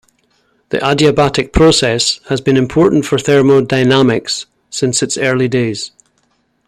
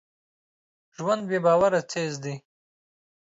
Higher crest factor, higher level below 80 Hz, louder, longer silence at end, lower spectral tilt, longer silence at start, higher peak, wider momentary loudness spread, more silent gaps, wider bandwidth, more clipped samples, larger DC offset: about the same, 14 dB vs 18 dB; first, -34 dBFS vs -68 dBFS; first, -12 LUFS vs -25 LUFS; second, 0.8 s vs 0.95 s; about the same, -4.5 dB/octave vs -5.5 dB/octave; second, 0.7 s vs 1 s; first, 0 dBFS vs -8 dBFS; second, 10 LU vs 15 LU; neither; first, 13 kHz vs 8 kHz; neither; neither